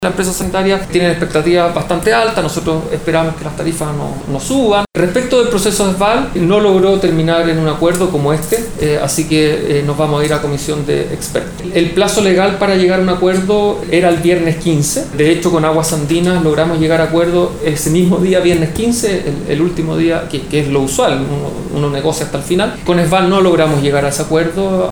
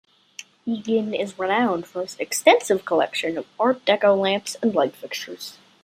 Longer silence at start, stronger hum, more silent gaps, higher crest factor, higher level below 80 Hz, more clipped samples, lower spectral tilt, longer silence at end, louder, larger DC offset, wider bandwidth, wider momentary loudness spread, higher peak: second, 0 s vs 0.4 s; neither; neither; second, 12 dB vs 20 dB; first, -32 dBFS vs -72 dBFS; neither; first, -5 dB/octave vs -3.5 dB/octave; second, 0 s vs 0.3 s; first, -13 LUFS vs -22 LUFS; neither; first, over 20 kHz vs 16 kHz; second, 6 LU vs 16 LU; about the same, 0 dBFS vs -2 dBFS